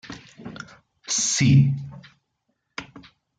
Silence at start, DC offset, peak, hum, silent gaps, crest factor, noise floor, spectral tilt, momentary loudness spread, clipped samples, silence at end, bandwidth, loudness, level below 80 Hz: 0.1 s; under 0.1%; -8 dBFS; none; none; 18 dB; -75 dBFS; -4 dB/octave; 24 LU; under 0.1%; 0.4 s; 9.4 kHz; -20 LUFS; -56 dBFS